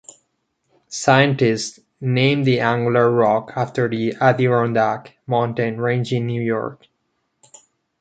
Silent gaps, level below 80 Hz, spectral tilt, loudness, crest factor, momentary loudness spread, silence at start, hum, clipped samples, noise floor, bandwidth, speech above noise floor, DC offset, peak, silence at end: none; -62 dBFS; -6 dB/octave; -19 LUFS; 18 dB; 9 LU; 0.9 s; none; under 0.1%; -71 dBFS; 9.2 kHz; 53 dB; under 0.1%; -2 dBFS; 1.25 s